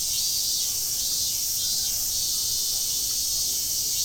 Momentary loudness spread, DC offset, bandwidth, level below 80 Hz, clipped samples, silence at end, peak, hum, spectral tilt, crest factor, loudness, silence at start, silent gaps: 1 LU; under 0.1%; over 20 kHz; -50 dBFS; under 0.1%; 0 s; -12 dBFS; none; 1.5 dB/octave; 14 dB; -23 LUFS; 0 s; none